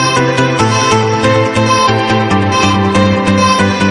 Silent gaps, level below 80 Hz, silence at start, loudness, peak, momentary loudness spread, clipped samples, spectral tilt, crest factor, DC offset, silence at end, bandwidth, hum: none; -40 dBFS; 0 s; -10 LUFS; 0 dBFS; 2 LU; under 0.1%; -5 dB/octave; 10 dB; under 0.1%; 0 s; 11.5 kHz; none